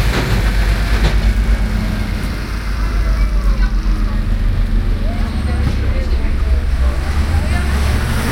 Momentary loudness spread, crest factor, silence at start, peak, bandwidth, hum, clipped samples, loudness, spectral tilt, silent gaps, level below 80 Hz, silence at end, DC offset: 4 LU; 14 dB; 0 s; 0 dBFS; 16 kHz; none; under 0.1%; -18 LUFS; -6 dB/octave; none; -16 dBFS; 0 s; under 0.1%